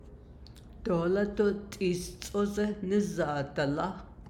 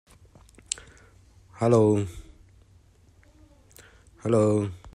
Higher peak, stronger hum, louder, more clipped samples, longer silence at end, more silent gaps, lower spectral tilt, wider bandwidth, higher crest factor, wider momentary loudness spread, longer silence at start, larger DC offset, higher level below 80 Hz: second, -16 dBFS vs -2 dBFS; neither; second, -31 LUFS vs -25 LUFS; neither; about the same, 0 s vs 0.05 s; neither; about the same, -6 dB/octave vs -6.5 dB/octave; first, 16.5 kHz vs 14 kHz; second, 16 dB vs 26 dB; second, 10 LU vs 15 LU; second, 0 s vs 1.6 s; neither; about the same, -52 dBFS vs -54 dBFS